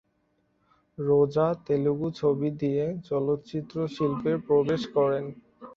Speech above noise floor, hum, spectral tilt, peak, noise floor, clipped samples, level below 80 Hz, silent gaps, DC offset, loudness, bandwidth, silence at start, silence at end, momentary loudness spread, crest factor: 45 dB; none; -8.5 dB/octave; -10 dBFS; -71 dBFS; under 0.1%; -62 dBFS; none; under 0.1%; -27 LUFS; 7 kHz; 1 s; 0 s; 8 LU; 16 dB